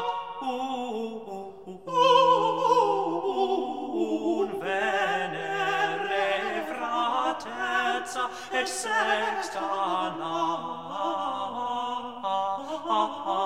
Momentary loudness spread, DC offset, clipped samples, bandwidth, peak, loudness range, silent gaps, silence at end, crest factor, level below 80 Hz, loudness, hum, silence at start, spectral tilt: 10 LU; 0.2%; under 0.1%; 15.5 kHz; -8 dBFS; 5 LU; none; 0 s; 20 dB; -70 dBFS; -27 LUFS; none; 0 s; -3 dB/octave